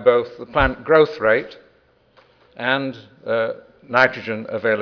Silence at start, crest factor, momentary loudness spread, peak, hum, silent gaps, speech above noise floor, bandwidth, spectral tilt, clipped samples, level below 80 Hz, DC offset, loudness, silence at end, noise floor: 0 s; 20 dB; 13 LU; 0 dBFS; none; none; 38 dB; 5.4 kHz; -6.5 dB/octave; under 0.1%; -40 dBFS; under 0.1%; -20 LUFS; 0 s; -57 dBFS